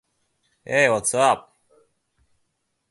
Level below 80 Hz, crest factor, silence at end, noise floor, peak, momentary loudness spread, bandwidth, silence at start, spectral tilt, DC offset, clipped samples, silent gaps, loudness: -64 dBFS; 22 dB; 1.5 s; -74 dBFS; -2 dBFS; 6 LU; 11.5 kHz; 0.7 s; -3 dB/octave; under 0.1%; under 0.1%; none; -20 LUFS